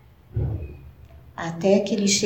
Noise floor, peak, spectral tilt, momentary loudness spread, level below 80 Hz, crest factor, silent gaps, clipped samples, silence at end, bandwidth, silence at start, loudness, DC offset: -46 dBFS; -6 dBFS; -4.5 dB/octave; 20 LU; -40 dBFS; 18 dB; none; under 0.1%; 0 s; 16.5 kHz; 0.35 s; -24 LUFS; 0.1%